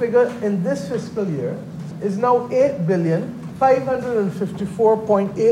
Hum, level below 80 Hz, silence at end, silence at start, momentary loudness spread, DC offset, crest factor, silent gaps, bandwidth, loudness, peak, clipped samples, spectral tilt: none; -56 dBFS; 0 s; 0 s; 9 LU; under 0.1%; 16 dB; none; 12 kHz; -20 LUFS; -4 dBFS; under 0.1%; -8 dB/octave